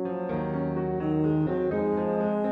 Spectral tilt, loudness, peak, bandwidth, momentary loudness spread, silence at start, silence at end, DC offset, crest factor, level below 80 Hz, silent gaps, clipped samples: -11 dB/octave; -27 LUFS; -14 dBFS; 4.7 kHz; 4 LU; 0 s; 0 s; under 0.1%; 12 dB; -52 dBFS; none; under 0.1%